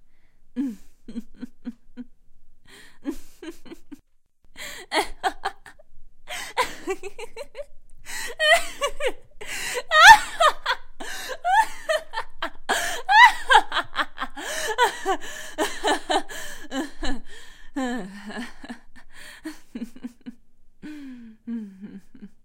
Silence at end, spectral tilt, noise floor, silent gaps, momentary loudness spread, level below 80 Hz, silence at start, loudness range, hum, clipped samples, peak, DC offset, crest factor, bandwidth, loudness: 0.1 s; -1 dB/octave; -56 dBFS; none; 22 LU; -42 dBFS; 0 s; 21 LU; none; under 0.1%; 0 dBFS; under 0.1%; 24 dB; 16 kHz; -21 LUFS